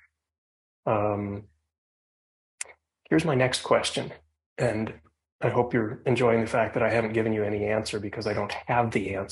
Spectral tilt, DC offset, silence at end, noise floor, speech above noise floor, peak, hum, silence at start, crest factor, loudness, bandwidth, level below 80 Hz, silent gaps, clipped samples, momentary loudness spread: -5.5 dB/octave; under 0.1%; 0 s; under -90 dBFS; over 64 dB; -8 dBFS; none; 0.85 s; 20 dB; -27 LUFS; 11.5 kHz; -56 dBFS; 1.78-2.58 s, 4.46-4.56 s, 5.32-5.39 s; under 0.1%; 13 LU